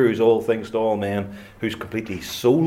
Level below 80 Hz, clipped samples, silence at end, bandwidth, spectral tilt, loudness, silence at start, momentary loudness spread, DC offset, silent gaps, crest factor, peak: -54 dBFS; under 0.1%; 0 s; 16.5 kHz; -6 dB/octave; -23 LUFS; 0 s; 11 LU; under 0.1%; none; 16 dB; -6 dBFS